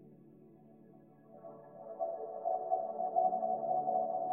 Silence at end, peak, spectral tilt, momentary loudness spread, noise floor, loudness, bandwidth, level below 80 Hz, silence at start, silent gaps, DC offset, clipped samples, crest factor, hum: 0 s; -20 dBFS; -11 dB/octave; 20 LU; -60 dBFS; -36 LUFS; 1.8 kHz; -88 dBFS; 0 s; none; under 0.1%; under 0.1%; 18 dB; none